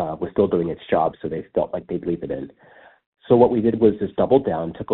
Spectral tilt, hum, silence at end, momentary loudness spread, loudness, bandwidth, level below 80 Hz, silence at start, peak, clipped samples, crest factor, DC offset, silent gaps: -7.5 dB/octave; none; 0 s; 11 LU; -21 LUFS; 4.2 kHz; -50 dBFS; 0 s; -2 dBFS; under 0.1%; 18 dB; under 0.1%; 3.06-3.12 s